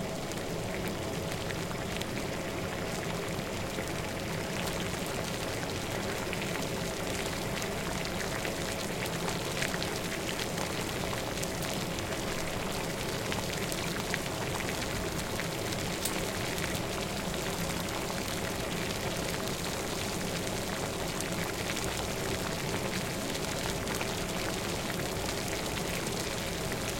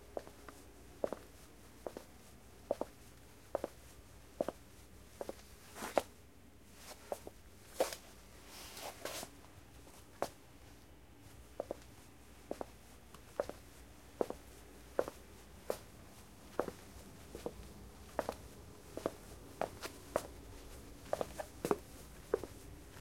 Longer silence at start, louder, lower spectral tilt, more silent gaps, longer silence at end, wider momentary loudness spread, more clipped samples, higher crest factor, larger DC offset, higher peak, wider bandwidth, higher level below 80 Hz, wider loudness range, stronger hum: about the same, 0 s vs 0 s; first, -33 LUFS vs -45 LUFS; about the same, -3.5 dB/octave vs -4 dB/octave; neither; about the same, 0 s vs 0 s; second, 2 LU vs 18 LU; neither; second, 24 dB vs 32 dB; neither; first, -10 dBFS vs -14 dBFS; about the same, 17 kHz vs 16.5 kHz; first, -48 dBFS vs -62 dBFS; second, 1 LU vs 6 LU; neither